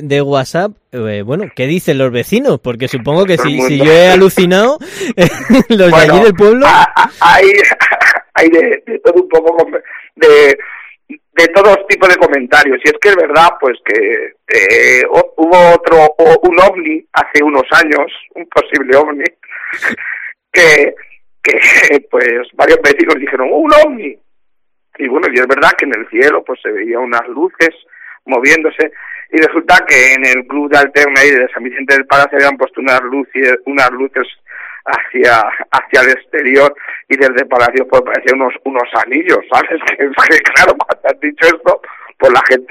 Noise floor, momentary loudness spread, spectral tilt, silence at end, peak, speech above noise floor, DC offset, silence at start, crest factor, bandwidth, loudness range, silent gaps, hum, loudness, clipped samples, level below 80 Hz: -65 dBFS; 11 LU; -4.5 dB/octave; 0.1 s; 0 dBFS; 56 dB; under 0.1%; 0 s; 10 dB; 16 kHz; 5 LU; none; none; -9 LUFS; 2%; -42 dBFS